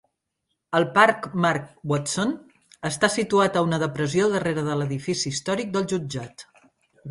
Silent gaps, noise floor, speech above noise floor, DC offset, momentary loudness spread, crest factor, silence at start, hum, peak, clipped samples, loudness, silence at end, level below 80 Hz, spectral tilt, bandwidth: none; -78 dBFS; 55 dB; under 0.1%; 12 LU; 22 dB; 0.7 s; none; -2 dBFS; under 0.1%; -23 LUFS; 0 s; -60 dBFS; -4.5 dB/octave; 11.5 kHz